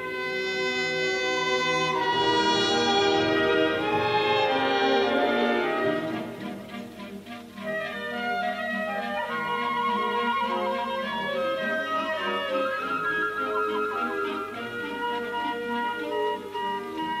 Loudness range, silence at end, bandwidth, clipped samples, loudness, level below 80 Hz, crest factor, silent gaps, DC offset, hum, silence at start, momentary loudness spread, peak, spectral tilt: 7 LU; 0 s; 15.5 kHz; under 0.1%; -26 LUFS; -64 dBFS; 16 dB; none; under 0.1%; 50 Hz at -60 dBFS; 0 s; 10 LU; -10 dBFS; -3.5 dB/octave